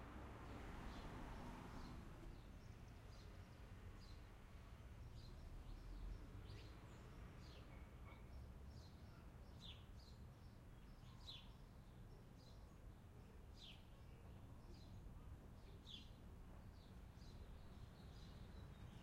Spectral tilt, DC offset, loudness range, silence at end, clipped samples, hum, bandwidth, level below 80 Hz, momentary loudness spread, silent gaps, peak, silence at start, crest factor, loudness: -6 dB/octave; under 0.1%; 4 LU; 0 s; under 0.1%; none; 15.5 kHz; -62 dBFS; 7 LU; none; -42 dBFS; 0 s; 16 dB; -61 LUFS